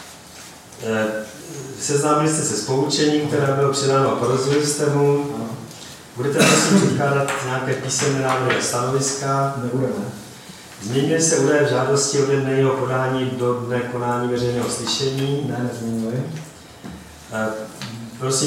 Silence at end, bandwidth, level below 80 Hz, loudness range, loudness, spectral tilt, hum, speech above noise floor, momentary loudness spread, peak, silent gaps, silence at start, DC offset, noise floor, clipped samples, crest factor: 0 s; 16.5 kHz; -56 dBFS; 5 LU; -20 LUFS; -4.5 dB/octave; none; 21 dB; 18 LU; -2 dBFS; none; 0 s; under 0.1%; -40 dBFS; under 0.1%; 18 dB